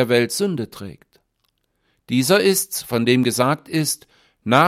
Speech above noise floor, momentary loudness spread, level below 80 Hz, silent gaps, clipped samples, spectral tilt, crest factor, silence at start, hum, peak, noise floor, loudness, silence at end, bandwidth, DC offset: 50 dB; 15 LU; -62 dBFS; none; under 0.1%; -4 dB/octave; 20 dB; 0 s; none; -2 dBFS; -70 dBFS; -19 LUFS; 0 s; 16.5 kHz; under 0.1%